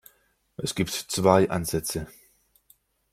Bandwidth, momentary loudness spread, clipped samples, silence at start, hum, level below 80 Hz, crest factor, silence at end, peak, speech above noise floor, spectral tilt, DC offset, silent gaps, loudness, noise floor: 16 kHz; 16 LU; under 0.1%; 0.6 s; none; -54 dBFS; 24 dB; 1.05 s; -4 dBFS; 41 dB; -4.5 dB/octave; under 0.1%; none; -25 LUFS; -65 dBFS